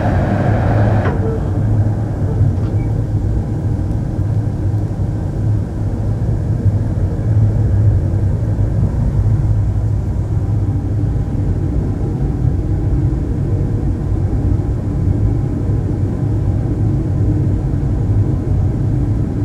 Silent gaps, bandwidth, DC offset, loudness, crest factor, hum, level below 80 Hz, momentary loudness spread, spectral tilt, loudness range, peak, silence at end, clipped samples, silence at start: none; 5.6 kHz; under 0.1%; -17 LUFS; 12 dB; none; -22 dBFS; 4 LU; -10 dB/octave; 2 LU; -2 dBFS; 0 s; under 0.1%; 0 s